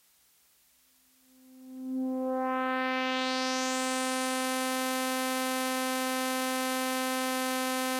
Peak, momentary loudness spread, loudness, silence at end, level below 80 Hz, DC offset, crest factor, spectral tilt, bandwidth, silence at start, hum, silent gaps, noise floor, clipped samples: -14 dBFS; 2 LU; -30 LUFS; 0 s; under -90 dBFS; under 0.1%; 18 dB; 0 dB/octave; 16 kHz; 1.5 s; none; none; -65 dBFS; under 0.1%